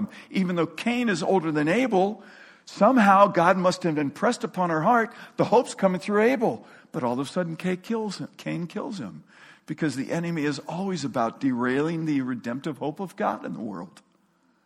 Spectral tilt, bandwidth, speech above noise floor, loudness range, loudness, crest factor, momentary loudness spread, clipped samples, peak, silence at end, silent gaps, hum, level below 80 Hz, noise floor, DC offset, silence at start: -6 dB/octave; 14 kHz; 40 dB; 9 LU; -25 LUFS; 20 dB; 13 LU; under 0.1%; -4 dBFS; 0.8 s; none; none; -70 dBFS; -65 dBFS; under 0.1%; 0 s